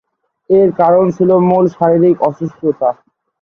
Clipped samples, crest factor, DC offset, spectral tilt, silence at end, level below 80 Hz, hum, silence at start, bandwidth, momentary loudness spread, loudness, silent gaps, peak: under 0.1%; 12 dB; under 0.1%; -10.5 dB/octave; 0.5 s; -54 dBFS; none; 0.5 s; 6.6 kHz; 8 LU; -12 LUFS; none; 0 dBFS